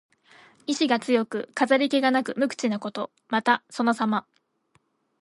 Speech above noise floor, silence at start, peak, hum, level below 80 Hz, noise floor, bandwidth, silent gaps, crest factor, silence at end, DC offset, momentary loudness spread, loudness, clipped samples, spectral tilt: 43 dB; 0.7 s; -6 dBFS; none; -78 dBFS; -68 dBFS; 11.5 kHz; none; 20 dB; 1 s; under 0.1%; 9 LU; -25 LUFS; under 0.1%; -4 dB/octave